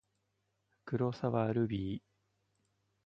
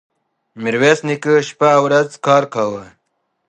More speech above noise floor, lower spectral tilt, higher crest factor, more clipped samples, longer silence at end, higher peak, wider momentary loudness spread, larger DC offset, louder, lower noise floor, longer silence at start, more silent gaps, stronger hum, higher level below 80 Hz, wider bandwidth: second, 47 dB vs 55 dB; first, -9 dB/octave vs -5 dB/octave; about the same, 20 dB vs 16 dB; neither; first, 1.05 s vs 0.65 s; second, -18 dBFS vs 0 dBFS; about the same, 9 LU vs 9 LU; neither; second, -35 LUFS vs -15 LUFS; first, -81 dBFS vs -70 dBFS; first, 0.85 s vs 0.55 s; neither; first, 50 Hz at -60 dBFS vs none; about the same, -64 dBFS vs -64 dBFS; second, 7.2 kHz vs 9.4 kHz